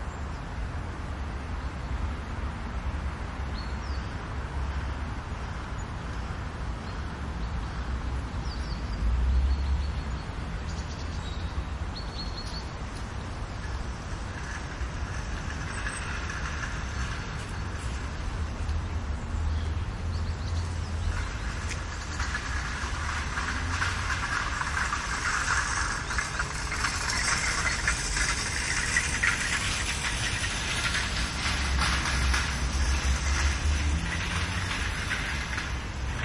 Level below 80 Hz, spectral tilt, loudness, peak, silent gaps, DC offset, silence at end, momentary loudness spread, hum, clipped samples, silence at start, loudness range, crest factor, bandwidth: -34 dBFS; -3.5 dB/octave; -31 LUFS; -10 dBFS; none; under 0.1%; 0 s; 10 LU; none; under 0.1%; 0 s; 9 LU; 20 dB; 11.5 kHz